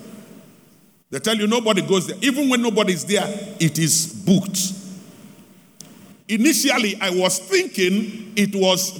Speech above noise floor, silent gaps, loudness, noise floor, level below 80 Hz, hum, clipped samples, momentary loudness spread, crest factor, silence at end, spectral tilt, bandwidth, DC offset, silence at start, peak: 34 dB; none; -19 LUFS; -53 dBFS; -68 dBFS; none; under 0.1%; 8 LU; 16 dB; 0 s; -3.5 dB/octave; over 20 kHz; under 0.1%; 0 s; -4 dBFS